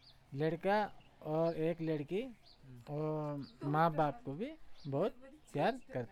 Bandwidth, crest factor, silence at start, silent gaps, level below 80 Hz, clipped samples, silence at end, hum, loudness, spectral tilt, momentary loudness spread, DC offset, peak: 14.5 kHz; 18 dB; 0.05 s; none; -66 dBFS; under 0.1%; 0 s; none; -38 LUFS; -8 dB/octave; 14 LU; under 0.1%; -18 dBFS